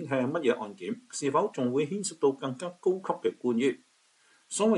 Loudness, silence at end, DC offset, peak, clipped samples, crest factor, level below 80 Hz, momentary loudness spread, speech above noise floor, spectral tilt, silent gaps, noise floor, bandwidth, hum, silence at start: -30 LUFS; 0 s; under 0.1%; -12 dBFS; under 0.1%; 16 dB; -80 dBFS; 8 LU; 36 dB; -5 dB/octave; none; -65 dBFS; 11.5 kHz; none; 0 s